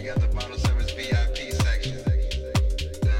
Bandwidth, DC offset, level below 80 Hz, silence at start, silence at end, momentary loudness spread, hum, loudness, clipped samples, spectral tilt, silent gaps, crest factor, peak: 15 kHz; under 0.1%; -26 dBFS; 0 s; 0 s; 2 LU; none; -26 LUFS; under 0.1%; -5.5 dB/octave; none; 14 dB; -10 dBFS